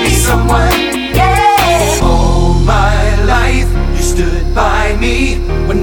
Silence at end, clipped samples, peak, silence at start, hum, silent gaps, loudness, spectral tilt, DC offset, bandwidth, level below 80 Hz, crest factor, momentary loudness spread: 0 s; under 0.1%; 0 dBFS; 0 s; none; none; -11 LUFS; -4.5 dB/octave; under 0.1%; 19 kHz; -14 dBFS; 10 dB; 6 LU